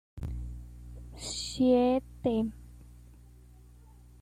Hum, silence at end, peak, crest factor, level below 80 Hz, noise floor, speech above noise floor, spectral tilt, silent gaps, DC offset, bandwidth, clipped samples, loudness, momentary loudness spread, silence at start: 60 Hz at -50 dBFS; 1.25 s; -14 dBFS; 18 dB; -46 dBFS; -54 dBFS; 27 dB; -5.5 dB/octave; none; under 0.1%; 13 kHz; under 0.1%; -30 LUFS; 23 LU; 0.15 s